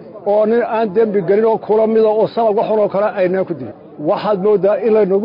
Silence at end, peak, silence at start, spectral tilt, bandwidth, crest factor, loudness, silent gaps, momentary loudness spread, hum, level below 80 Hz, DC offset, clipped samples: 0 s; -4 dBFS; 0 s; -10.5 dB/octave; 5.4 kHz; 10 dB; -15 LUFS; none; 6 LU; none; -62 dBFS; under 0.1%; under 0.1%